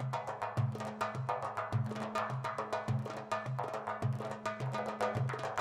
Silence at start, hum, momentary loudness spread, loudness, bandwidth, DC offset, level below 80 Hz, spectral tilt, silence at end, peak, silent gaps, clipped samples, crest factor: 0 s; none; 3 LU; -38 LUFS; 13 kHz; under 0.1%; -68 dBFS; -6.5 dB/octave; 0 s; -20 dBFS; none; under 0.1%; 18 dB